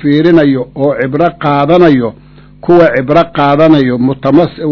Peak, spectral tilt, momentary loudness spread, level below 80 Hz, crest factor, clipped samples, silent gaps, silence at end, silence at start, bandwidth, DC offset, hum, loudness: 0 dBFS; -9 dB/octave; 6 LU; -40 dBFS; 8 dB; 4%; none; 0 s; 0 s; 6 kHz; 0.3%; none; -9 LUFS